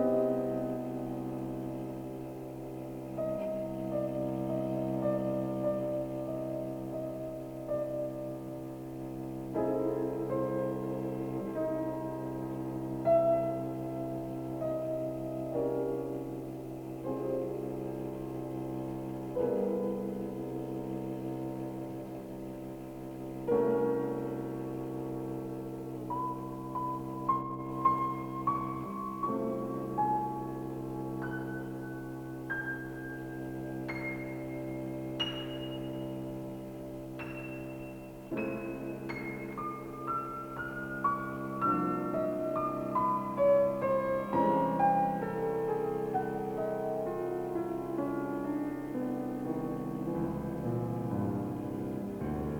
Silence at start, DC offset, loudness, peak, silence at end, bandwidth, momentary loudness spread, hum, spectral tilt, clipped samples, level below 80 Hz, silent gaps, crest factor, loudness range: 0 s; under 0.1%; -35 LUFS; -16 dBFS; 0 s; over 20 kHz; 11 LU; none; -7.5 dB/octave; under 0.1%; -58 dBFS; none; 18 dB; 8 LU